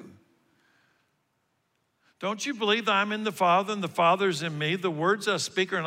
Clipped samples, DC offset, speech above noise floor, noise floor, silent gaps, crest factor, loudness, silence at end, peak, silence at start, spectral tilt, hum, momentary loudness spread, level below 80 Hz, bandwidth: under 0.1%; under 0.1%; 48 dB; -75 dBFS; none; 18 dB; -26 LUFS; 0 s; -12 dBFS; 0 s; -4 dB/octave; none; 7 LU; -80 dBFS; 16 kHz